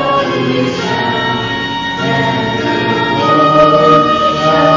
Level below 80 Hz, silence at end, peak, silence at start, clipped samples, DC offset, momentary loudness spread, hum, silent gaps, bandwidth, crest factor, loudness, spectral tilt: -40 dBFS; 0 s; 0 dBFS; 0 s; under 0.1%; under 0.1%; 8 LU; none; none; 7.6 kHz; 12 dB; -12 LUFS; -5.5 dB/octave